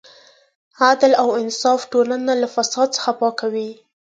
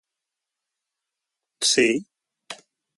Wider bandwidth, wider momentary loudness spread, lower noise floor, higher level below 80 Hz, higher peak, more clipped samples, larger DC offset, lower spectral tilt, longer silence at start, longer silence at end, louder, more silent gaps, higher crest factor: second, 9.2 kHz vs 11.5 kHz; second, 9 LU vs 22 LU; second, -49 dBFS vs -85 dBFS; about the same, -72 dBFS vs -72 dBFS; first, 0 dBFS vs -8 dBFS; neither; neither; about the same, -2 dB/octave vs -1.5 dB/octave; second, 0.8 s vs 1.6 s; about the same, 0.4 s vs 0.45 s; first, -18 LUFS vs -21 LUFS; neither; about the same, 18 dB vs 20 dB